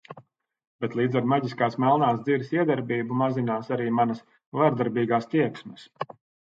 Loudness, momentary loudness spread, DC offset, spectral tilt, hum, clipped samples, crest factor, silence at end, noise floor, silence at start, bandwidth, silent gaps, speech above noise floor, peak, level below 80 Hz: -25 LUFS; 15 LU; under 0.1%; -8.5 dB/octave; none; under 0.1%; 18 dB; 0.35 s; -54 dBFS; 0.1 s; 7.6 kHz; 0.67-0.79 s, 4.46-4.52 s; 30 dB; -8 dBFS; -72 dBFS